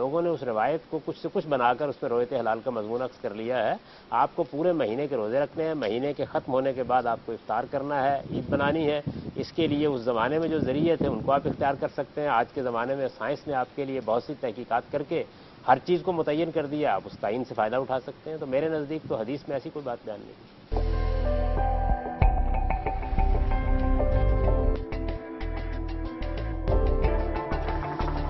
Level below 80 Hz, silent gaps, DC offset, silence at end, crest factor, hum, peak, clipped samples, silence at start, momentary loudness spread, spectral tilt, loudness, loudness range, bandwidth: -32 dBFS; none; under 0.1%; 0 s; 20 dB; none; -6 dBFS; under 0.1%; 0 s; 9 LU; -9 dB/octave; -28 LUFS; 4 LU; 6 kHz